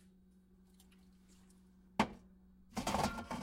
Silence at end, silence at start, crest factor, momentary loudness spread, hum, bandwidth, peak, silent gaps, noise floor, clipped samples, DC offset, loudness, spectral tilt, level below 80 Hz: 0 s; 2 s; 26 dB; 10 LU; none; 16 kHz; -18 dBFS; none; -66 dBFS; under 0.1%; under 0.1%; -40 LUFS; -4.5 dB/octave; -60 dBFS